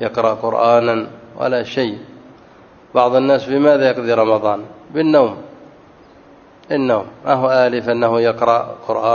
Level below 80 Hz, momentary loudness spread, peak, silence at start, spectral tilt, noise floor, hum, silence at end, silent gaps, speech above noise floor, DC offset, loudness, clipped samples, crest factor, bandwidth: -60 dBFS; 9 LU; 0 dBFS; 0 s; -7 dB/octave; -44 dBFS; none; 0 s; none; 29 dB; under 0.1%; -16 LUFS; under 0.1%; 16 dB; 7 kHz